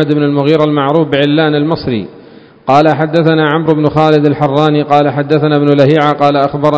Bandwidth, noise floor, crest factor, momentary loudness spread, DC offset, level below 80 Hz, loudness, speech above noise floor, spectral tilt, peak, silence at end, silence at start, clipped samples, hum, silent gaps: 8 kHz; -37 dBFS; 10 dB; 4 LU; under 0.1%; -46 dBFS; -10 LUFS; 27 dB; -8 dB/octave; 0 dBFS; 0 s; 0 s; 0.9%; none; none